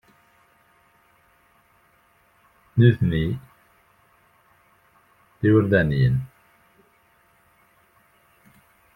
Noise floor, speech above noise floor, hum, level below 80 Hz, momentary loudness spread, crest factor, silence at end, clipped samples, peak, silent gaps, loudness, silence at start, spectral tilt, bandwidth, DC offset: -61 dBFS; 42 dB; none; -48 dBFS; 11 LU; 22 dB; 2.7 s; under 0.1%; -4 dBFS; none; -21 LUFS; 2.75 s; -9.5 dB/octave; 4.4 kHz; under 0.1%